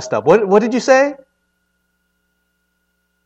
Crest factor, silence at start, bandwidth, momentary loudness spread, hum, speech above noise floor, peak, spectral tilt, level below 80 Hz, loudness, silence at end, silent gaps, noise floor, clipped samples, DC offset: 18 dB; 0 s; 8.2 kHz; 2 LU; none; 54 dB; 0 dBFS; -5 dB/octave; -62 dBFS; -13 LUFS; 2.1 s; none; -67 dBFS; under 0.1%; under 0.1%